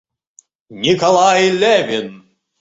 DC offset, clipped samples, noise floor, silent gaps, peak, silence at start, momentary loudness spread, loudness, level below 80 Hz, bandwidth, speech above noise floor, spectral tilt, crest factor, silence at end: under 0.1%; under 0.1%; -52 dBFS; none; -2 dBFS; 0.7 s; 11 LU; -14 LUFS; -58 dBFS; 8 kHz; 38 dB; -3.5 dB/octave; 14 dB; 0.45 s